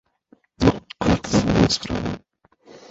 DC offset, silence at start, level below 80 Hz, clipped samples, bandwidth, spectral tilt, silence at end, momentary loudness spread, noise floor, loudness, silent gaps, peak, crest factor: under 0.1%; 0.6 s; -36 dBFS; under 0.1%; 8 kHz; -5.5 dB/octave; 0.15 s; 10 LU; -58 dBFS; -21 LUFS; none; -4 dBFS; 20 dB